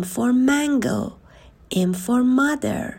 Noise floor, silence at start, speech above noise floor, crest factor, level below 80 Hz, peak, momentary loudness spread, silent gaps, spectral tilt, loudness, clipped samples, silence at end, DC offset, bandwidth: -43 dBFS; 0 s; 23 dB; 14 dB; -52 dBFS; -8 dBFS; 9 LU; none; -5.5 dB/octave; -20 LUFS; under 0.1%; 0 s; under 0.1%; 16.5 kHz